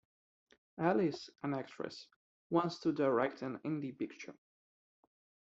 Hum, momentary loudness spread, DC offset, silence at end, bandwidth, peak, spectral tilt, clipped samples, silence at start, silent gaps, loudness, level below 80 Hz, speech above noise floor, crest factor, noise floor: none; 15 LU; under 0.1%; 1.2 s; 7.8 kHz; -16 dBFS; -5.5 dB/octave; under 0.1%; 0.75 s; 2.16-2.50 s; -37 LUFS; -80 dBFS; over 54 dB; 22 dB; under -90 dBFS